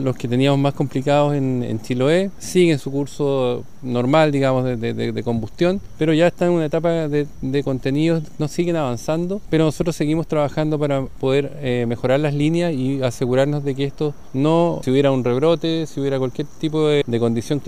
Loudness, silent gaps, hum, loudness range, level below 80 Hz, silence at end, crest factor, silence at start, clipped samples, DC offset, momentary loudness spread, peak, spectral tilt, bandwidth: -20 LUFS; none; none; 2 LU; -44 dBFS; 0.05 s; 16 dB; 0 s; under 0.1%; 2%; 6 LU; -2 dBFS; -7 dB/octave; 15 kHz